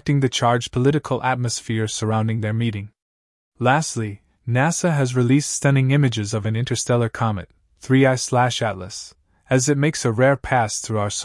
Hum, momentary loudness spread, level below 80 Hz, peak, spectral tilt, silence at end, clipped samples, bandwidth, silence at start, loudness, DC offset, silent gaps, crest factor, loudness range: none; 10 LU; -52 dBFS; -2 dBFS; -5 dB/octave; 0 s; under 0.1%; 12 kHz; 0.05 s; -20 LUFS; under 0.1%; 3.02-3.52 s; 18 dB; 3 LU